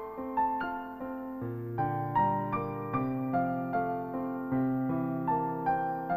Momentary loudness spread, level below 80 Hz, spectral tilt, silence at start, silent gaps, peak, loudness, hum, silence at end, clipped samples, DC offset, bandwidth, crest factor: 8 LU; -60 dBFS; -10.5 dB/octave; 0 s; none; -16 dBFS; -32 LUFS; none; 0 s; under 0.1%; under 0.1%; 15 kHz; 14 dB